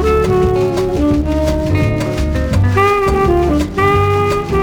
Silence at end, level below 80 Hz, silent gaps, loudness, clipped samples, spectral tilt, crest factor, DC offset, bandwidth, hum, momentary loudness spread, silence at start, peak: 0 s; -22 dBFS; none; -14 LUFS; under 0.1%; -7 dB/octave; 12 dB; under 0.1%; 19 kHz; none; 4 LU; 0 s; -2 dBFS